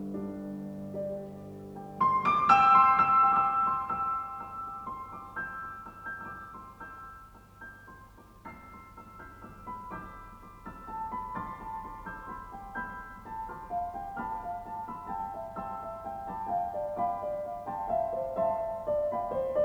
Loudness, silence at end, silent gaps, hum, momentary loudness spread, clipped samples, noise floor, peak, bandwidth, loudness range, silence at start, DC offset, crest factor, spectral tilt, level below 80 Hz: -30 LUFS; 0 s; none; none; 24 LU; under 0.1%; -53 dBFS; -8 dBFS; over 20 kHz; 21 LU; 0 s; under 0.1%; 24 dB; -6.5 dB/octave; -56 dBFS